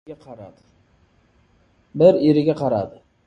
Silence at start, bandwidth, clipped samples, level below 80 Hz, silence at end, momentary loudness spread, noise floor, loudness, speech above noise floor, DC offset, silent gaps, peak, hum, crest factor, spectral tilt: 0.1 s; 7.6 kHz; under 0.1%; -56 dBFS; 0.35 s; 26 LU; -59 dBFS; -17 LUFS; 40 dB; under 0.1%; none; -2 dBFS; none; 20 dB; -9 dB/octave